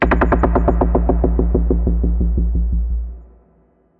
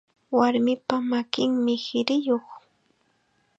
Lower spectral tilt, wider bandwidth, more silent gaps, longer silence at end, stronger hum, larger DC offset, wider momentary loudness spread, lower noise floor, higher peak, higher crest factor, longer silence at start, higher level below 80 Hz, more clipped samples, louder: first, -11 dB/octave vs -5 dB/octave; second, 3.3 kHz vs 7.8 kHz; neither; second, 0.75 s vs 1 s; neither; neither; about the same, 7 LU vs 5 LU; second, -55 dBFS vs -68 dBFS; about the same, -2 dBFS vs -4 dBFS; second, 14 dB vs 22 dB; second, 0 s vs 0.3 s; first, -18 dBFS vs -76 dBFS; neither; first, -18 LUFS vs -24 LUFS